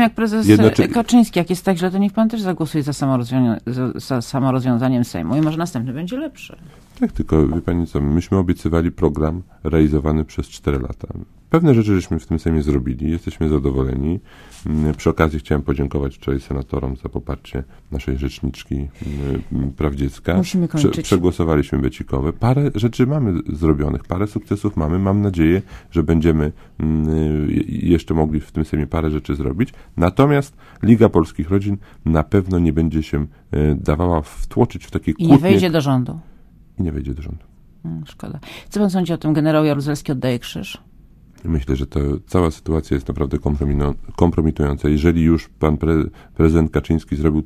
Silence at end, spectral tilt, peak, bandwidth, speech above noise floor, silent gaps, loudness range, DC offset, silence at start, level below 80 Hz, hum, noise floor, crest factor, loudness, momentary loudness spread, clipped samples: 0 s; -7.5 dB/octave; 0 dBFS; 15.5 kHz; 28 dB; none; 5 LU; under 0.1%; 0 s; -28 dBFS; none; -46 dBFS; 18 dB; -19 LUFS; 12 LU; under 0.1%